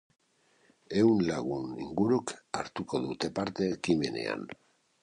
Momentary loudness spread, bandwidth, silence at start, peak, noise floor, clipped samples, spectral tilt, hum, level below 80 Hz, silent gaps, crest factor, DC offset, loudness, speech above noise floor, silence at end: 12 LU; 11 kHz; 0.9 s; -12 dBFS; -68 dBFS; under 0.1%; -6 dB/octave; none; -62 dBFS; none; 18 dB; under 0.1%; -31 LUFS; 38 dB; 0.5 s